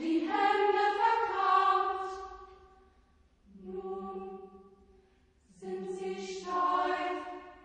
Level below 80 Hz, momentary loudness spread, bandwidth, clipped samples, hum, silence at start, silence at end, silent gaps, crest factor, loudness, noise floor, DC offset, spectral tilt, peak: -66 dBFS; 19 LU; 9.4 kHz; under 0.1%; none; 0 s; 0.05 s; none; 18 dB; -31 LUFS; -66 dBFS; under 0.1%; -4.5 dB/octave; -14 dBFS